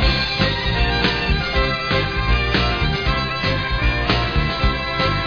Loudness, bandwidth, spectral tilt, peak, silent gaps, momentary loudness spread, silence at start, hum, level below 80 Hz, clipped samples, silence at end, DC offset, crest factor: -19 LUFS; 5.4 kHz; -6 dB/octave; -4 dBFS; none; 2 LU; 0 s; none; -24 dBFS; under 0.1%; 0 s; 0.4%; 16 dB